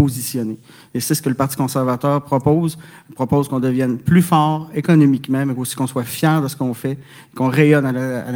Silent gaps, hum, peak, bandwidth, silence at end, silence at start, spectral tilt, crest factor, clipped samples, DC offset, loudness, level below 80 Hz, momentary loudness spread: none; none; 0 dBFS; over 20 kHz; 0 s; 0 s; -6.5 dB/octave; 16 dB; under 0.1%; under 0.1%; -18 LUFS; -52 dBFS; 12 LU